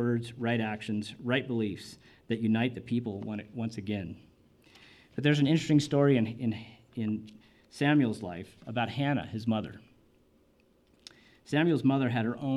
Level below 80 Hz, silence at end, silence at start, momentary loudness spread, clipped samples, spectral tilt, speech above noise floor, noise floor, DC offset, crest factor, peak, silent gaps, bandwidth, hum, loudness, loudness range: -66 dBFS; 0 s; 0 s; 15 LU; under 0.1%; -7 dB/octave; 36 dB; -66 dBFS; under 0.1%; 18 dB; -12 dBFS; none; 12 kHz; none; -30 LUFS; 6 LU